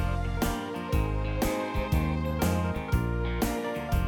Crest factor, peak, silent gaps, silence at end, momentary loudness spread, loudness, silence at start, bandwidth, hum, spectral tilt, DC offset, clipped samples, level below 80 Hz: 16 dB; -12 dBFS; none; 0 s; 3 LU; -30 LUFS; 0 s; 19 kHz; none; -6 dB/octave; under 0.1%; under 0.1%; -34 dBFS